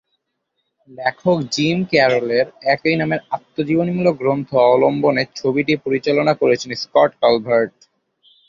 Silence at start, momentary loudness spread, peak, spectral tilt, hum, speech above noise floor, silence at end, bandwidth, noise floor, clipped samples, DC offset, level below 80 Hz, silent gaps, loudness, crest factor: 0.9 s; 6 LU; -2 dBFS; -6 dB/octave; none; 57 dB; 0.8 s; 7.6 kHz; -74 dBFS; under 0.1%; under 0.1%; -60 dBFS; none; -17 LUFS; 16 dB